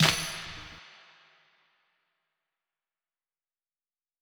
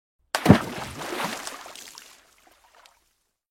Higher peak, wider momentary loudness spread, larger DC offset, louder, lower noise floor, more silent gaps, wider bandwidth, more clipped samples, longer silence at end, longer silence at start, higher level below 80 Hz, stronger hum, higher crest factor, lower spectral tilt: second, -6 dBFS vs 0 dBFS; about the same, 25 LU vs 23 LU; neither; second, -31 LUFS vs -24 LUFS; first, under -90 dBFS vs -71 dBFS; neither; first, over 20 kHz vs 16.5 kHz; neither; first, 3.3 s vs 1.5 s; second, 0 s vs 0.35 s; second, -62 dBFS vs -52 dBFS; neither; about the same, 30 dB vs 28 dB; second, -3 dB/octave vs -5.5 dB/octave